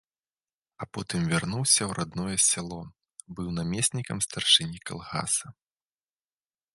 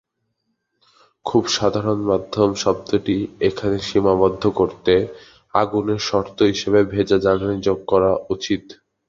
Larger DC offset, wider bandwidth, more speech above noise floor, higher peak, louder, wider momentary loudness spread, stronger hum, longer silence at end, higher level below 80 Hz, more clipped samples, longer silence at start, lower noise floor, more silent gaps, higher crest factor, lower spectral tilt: neither; first, 12 kHz vs 7.6 kHz; first, over 62 dB vs 54 dB; second, -6 dBFS vs -2 dBFS; second, -25 LUFS vs -19 LUFS; first, 18 LU vs 6 LU; neither; first, 1.2 s vs 0.35 s; second, -56 dBFS vs -46 dBFS; neither; second, 0.8 s vs 1.25 s; first, under -90 dBFS vs -73 dBFS; neither; first, 24 dB vs 18 dB; second, -2.5 dB/octave vs -5.5 dB/octave